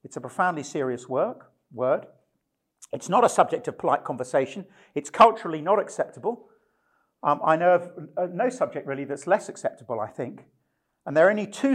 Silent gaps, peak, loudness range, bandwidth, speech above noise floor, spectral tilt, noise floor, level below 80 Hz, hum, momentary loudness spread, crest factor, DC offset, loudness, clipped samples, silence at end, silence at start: none; -6 dBFS; 4 LU; 13 kHz; 53 dB; -5 dB/octave; -77 dBFS; -70 dBFS; none; 15 LU; 20 dB; under 0.1%; -25 LUFS; under 0.1%; 0 s; 0.05 s